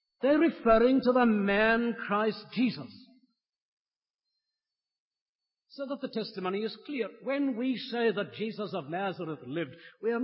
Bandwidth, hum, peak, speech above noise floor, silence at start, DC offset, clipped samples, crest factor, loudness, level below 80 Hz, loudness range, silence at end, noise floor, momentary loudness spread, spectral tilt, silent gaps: 5.8 kHz; none; -12 dBFS; over 61 dB; 0.2 s; under 0.1%; under 0.1%; 18 dB; -29 LUFS; -60 dBFS; 14 LU; 0 s; under -90 dBFS; 13 LU; -9.5 dB/octave; 3.62-3.77 s, 3.96-4.00 s, 4.10-4.14 s, 5.00-5.11 s, 5.22-5.39 s